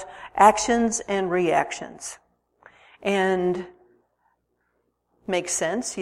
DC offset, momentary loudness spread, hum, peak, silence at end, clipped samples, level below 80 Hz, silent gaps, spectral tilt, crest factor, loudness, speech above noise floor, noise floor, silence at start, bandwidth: under 0.1%; 18 LU; 60 Hz at -55 dBFS; -2 dBFS; 0 s; under 0.1%; -58 dBFS; none; -3.5 dB/octave; 22 dB; -23 LUFS; 50 dB; -72 dBFS; 0 s; 14.5 kHz